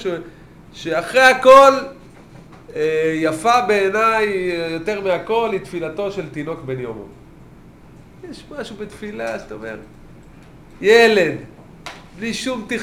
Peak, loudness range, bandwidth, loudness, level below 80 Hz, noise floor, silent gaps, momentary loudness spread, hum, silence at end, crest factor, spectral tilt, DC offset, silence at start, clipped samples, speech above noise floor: 0 dBFS; 17 LU; 16 kHz; -16 LUFS; -50 dBFS; -43 dBFS; none; 22 LU; none; 0 s; 18 dB; -4 dB/octave; 0.1%; 0 s; under 0.1%; 26 dB